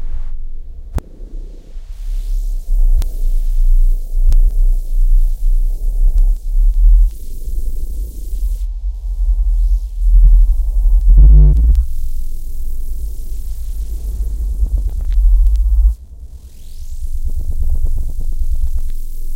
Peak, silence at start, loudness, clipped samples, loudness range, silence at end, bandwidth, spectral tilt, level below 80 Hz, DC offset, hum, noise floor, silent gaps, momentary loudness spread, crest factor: 0 dBFS; 0 s; -18 LUFS; under 0.1%; 9 LU; 0 s; 1 kHz; -7.5 dB/octave; -12 dBFS; under 0.1%; none; -32 dBFS; none; 17 LU; 12 dB